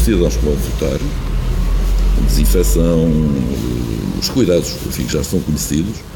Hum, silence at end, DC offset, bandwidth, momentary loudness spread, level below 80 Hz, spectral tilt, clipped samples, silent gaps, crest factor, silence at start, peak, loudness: none; 0 s; under 0.1%; 18 kHz; 7 LU; -18 dBFS; -5.5 dB/octave; under 0.1%; none; 14 dB; 0 s; -2 dBFS; -17 LUFS